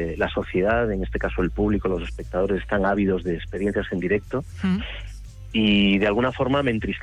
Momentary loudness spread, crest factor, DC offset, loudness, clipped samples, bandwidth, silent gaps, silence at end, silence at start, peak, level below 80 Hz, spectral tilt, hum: 9 LU; 14 dB; under 0.1%; -23 LUFS; under 0.1%; 9.8 kHz; none; 0 s; 0 s; -8 dBFS; -36 dBFS; -7 dB/octave; none